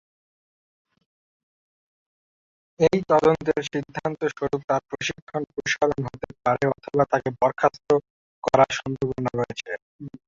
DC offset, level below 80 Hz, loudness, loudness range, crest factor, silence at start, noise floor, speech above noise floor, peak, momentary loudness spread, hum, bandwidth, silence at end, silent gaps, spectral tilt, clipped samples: under 0.1%; -56 dBFS; -24 LUFS; 3 LU; 22 dB; 2.8 s; under -90 dBFS; over 66 dB; -2 dBFS; 11 LU; none; 7.8 kHz; 0.2 s; 4.64-4.68 s, 5.22-5.27 s, 8.10-8.42 s, 9.82-9.99 s; -5.5 dB/octave; under 0.1%